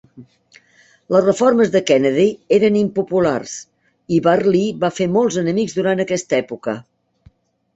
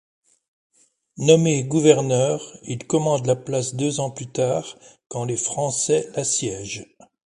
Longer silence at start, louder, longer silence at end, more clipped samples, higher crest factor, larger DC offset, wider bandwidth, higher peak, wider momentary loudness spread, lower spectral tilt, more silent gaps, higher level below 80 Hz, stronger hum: second, 0.15 s vs 1.15 s; first, -17 LUFS vs -21 LUFS; first, 0.95 s vs 0.5 s; neither; second, 16 dB vs 22 dB; neither; second, 8.2 kHz vs 11.5 kHz; about the same, -2 dBFS vs 0 dBFS; second, 11 LU vs 15 LU; about the same, -5.5 dB/octave vs -4.5 dB/octave; neither; about the same, -56 dBFS vs -60 dBFS; neither